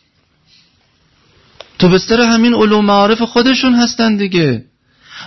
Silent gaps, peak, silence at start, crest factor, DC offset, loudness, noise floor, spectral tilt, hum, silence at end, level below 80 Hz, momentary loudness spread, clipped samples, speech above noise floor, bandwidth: none; 0 dBFS; 1.8 s; 12 dB; under 0.1%; -11 LUFS; -56 dBFS; -5 dB/octave; none; 0 s; -44 dBFS; 4 LU; under 0.1%; 46 dB; 6.2 kHz